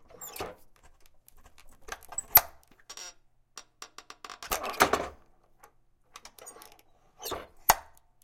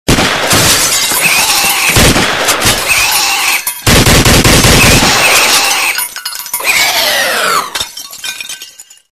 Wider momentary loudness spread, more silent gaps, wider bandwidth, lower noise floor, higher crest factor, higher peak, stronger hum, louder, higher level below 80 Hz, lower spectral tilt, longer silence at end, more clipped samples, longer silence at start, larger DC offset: first, 27 LU vs 13 LU; neither; about the same, 16.5 kHz vs 16 kHz; first, -62 dBFS vs -33 dBFS; first, 30 dB vs 10 dB; second, -4 dBFS vs 0 dBFS; neither; second, -28 LUFS vs -7 LUFS; second, -56 dBFS vs -22 dBFS; about the same, -1.5 dB/octave vs -2 dB/octave; about the same, 0.4 s vs 0.3 s; second, under 0.1% vs 0.7%; about the same, 0.2 s vs 0.1 s; neither